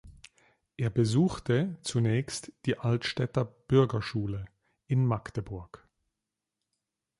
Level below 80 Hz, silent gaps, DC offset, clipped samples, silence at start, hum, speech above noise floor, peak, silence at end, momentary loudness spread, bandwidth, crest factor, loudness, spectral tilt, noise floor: -56 dBFS; none; under 0.1%; under 0.1%; 0.05 s; none; 59 dB; -10 dBFS; 1.45 s; 12 LU; 11.5 kHz; 20 dB; -30 LUFS; -6.5 dB/octave; -87 dBFS